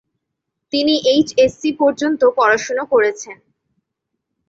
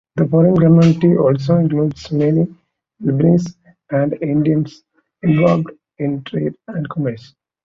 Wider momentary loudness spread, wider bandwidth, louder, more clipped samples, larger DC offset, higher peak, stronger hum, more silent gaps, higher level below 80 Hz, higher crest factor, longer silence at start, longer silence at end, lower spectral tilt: second, 7 LU vs 13 LU; about the same, 7.8 kHz vs 7.2 kHz; about the same, -16 LUFS vs -16 LUFS; neither; neither; about the same, -2 dBFS vs -2 dBFS; neither; neither; about the same, -56 dBFS vs -52 dBFS; about the same, 16 dB vs 14 dB; first, 0.75 s vs 0.15 s; first, 1.15 s vs 0.45 s; second, -3 dB/octave vs -9 dB/octave